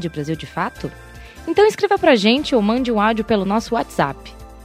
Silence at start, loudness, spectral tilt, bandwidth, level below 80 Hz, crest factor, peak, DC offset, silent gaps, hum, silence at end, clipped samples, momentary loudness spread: 0 s; -18 LUFS; -5.5 dB/octave; 15.5 kHz; -42 dBFS; 16 dB; -2 dBFS; under 0.1%; none; none; 0 s; under 0.1%; 12 LU